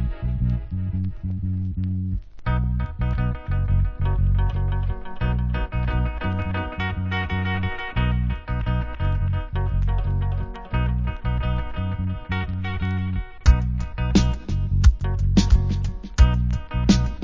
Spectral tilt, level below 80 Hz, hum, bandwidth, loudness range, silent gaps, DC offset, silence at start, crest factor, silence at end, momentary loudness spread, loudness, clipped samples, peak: -6.5 dB/octave; -24 dBFS; none; 7.6 kHz; 5 LU; none; under 0.1%; 0 s; 20 dB; 0 s; 8 LU; -24 LUFS; under 0.1%; -2 dBFS